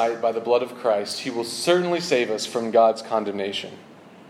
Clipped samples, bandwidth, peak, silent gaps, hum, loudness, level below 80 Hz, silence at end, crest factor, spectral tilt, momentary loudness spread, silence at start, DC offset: under 0.1%; 14.5 kHz; -6 dBFS; none; none; -23 LUFS; -76 dBFS; 0 s; 18 dB; -4 dB/octave; 9 LU; 0 s; under 0.1%